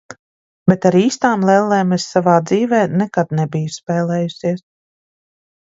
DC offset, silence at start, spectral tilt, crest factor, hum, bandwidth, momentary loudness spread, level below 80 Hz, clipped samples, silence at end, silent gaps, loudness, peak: under 0.1%; 0.1 s; -6.5 dB/octave; 16 dB; none; 7.8 kHz; 8 LU; -56 dBFS; under 0.1%; 1.1 s; 0.19-0.66 s; -16 LUFS; 0 dBFS